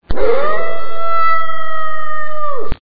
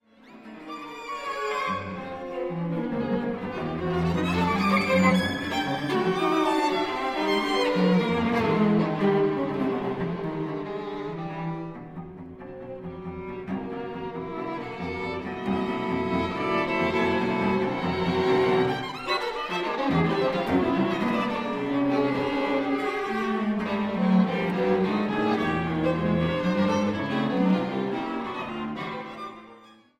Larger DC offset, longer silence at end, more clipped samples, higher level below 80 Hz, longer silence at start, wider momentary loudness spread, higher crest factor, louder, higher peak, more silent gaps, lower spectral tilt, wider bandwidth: first, 50% vs under 0.1%; second, 0 s vs 0.25 s; neither; first, -32 dBFS vs -52 dBFS; second, 0 s vs 0.25 s; second, 8 LU vs 13 LU; second, 12 dB vs 18 dB; first, -19 LUFS vs -26 LUFS; first, 0 dBFS vs -8 dBFS; neither; about the same, -7.5 dB/octave vs -6.5 dB/octave; second, 5 kHz vs 14.5 kHz